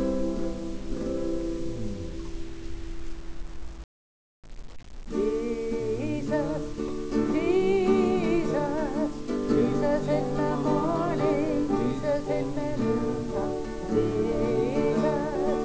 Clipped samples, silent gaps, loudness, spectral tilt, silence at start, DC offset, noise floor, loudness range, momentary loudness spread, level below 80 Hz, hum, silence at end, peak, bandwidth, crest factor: under 0.1%; 3.84-4.43 s; -27 LUFS; -7 dB/octave; 0 s; under 0.1%; under -90 dBFS; 11 LU; 16 LU; -42 dBFS; none; 0 s; -12 dBFS; 8 kHz; 16 dB